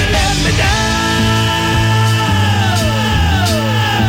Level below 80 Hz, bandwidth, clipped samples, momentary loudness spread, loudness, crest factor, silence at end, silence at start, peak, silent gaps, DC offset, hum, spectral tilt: -24 dBFS; 16.5 kHz; under 0.1%; 1 LU; -13 LUFS; 8 dB; 0 s; 0 s; -4 dBFS; none; under 0.1%; none; -4.5 dB/octave